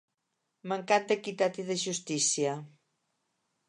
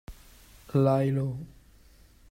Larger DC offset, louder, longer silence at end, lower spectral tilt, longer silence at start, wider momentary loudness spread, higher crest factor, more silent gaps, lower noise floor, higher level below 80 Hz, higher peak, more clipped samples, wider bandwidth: neither; second, -30 LUFS vs -27 LUFS; first, 1 s vs 0.85 s; second, -2.5 dB/octave vs -9 dB/octave; first, 0.65 s vs 0.1 s; second, 9 LU vs 17 LU; about the same, 22 dB vs 18 dB; neither; first, -82 dBFS vs -56 dBFS; second, -86 dBFS vs -54 dBFS; about the same, -12 dBFS vs -12 dBFS; neither; second, 11.5 kHz vs 15.5 kHz